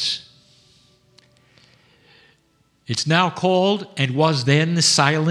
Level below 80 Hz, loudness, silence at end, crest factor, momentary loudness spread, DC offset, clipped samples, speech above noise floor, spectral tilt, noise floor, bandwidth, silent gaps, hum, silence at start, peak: -68 dBFS; -18 LUFS; 0 s; 22 dB; 9 LU; under 0.1%; under 0.1%; 44 dB; -4 dB/octave; -62 dBFS; 13.5 kHz; none; none; 0 s; 0 dBFS